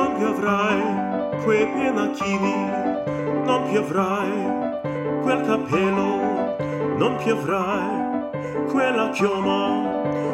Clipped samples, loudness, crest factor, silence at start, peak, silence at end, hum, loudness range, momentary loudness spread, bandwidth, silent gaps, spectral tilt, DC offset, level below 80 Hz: under 0.1%; -22 LUFS; 14 dB; 0 s; -8 dBFS; 0 s; none; 1 LU; 5 LU; 12.5 kHz; none; -6 dB/octave; under 0.1%; -56 dBFS